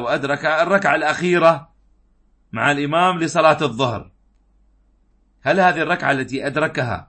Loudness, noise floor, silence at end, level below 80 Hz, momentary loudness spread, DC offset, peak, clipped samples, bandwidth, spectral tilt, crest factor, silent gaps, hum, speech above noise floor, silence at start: -18 LUFS; -58 dBFS; 0.05 s; -54 dBFS; 8 LU; under 0.1%; -2 dBFS; under 0.1%; 8.8 kHz; -5 dB/octave; 18 dB; none; none; 40 dB; 0 s